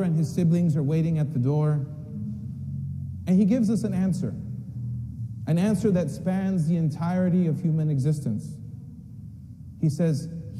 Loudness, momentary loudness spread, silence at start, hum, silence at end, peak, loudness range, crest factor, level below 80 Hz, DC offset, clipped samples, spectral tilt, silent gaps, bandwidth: -26 LUFS; 16 LU; 0 s; none; 0 s; -12 dBFS; 2 LU; 14 dB; -52 dBFS; under 0.1%; under 0.1%; -8.5 dB/octave; none; 12 kHz